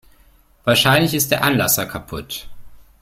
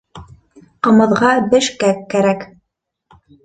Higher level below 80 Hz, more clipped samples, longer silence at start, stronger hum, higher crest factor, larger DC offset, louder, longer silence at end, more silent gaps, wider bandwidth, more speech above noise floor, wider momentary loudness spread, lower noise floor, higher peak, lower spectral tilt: first, -44 dBFS vs -52 dBFS; neither; first, 0.65 s vs 0.15 s; neither; about the same, 20 dB vs 16 dB; neither; about the same, -16 LUFS vs -14 LUFS; second, 0.2 s vs 1 s; neither; first, 16.5 kHz vs 9.2 kHz; second, 35 dB vs 62 dB; first, 16 LU vs 7 LU; second, -52 dBFS vs -75 dBFS; about the same, 0 dBFS vs 0 dBFS; second, -3.5 dB/octave vs -5 dB/octave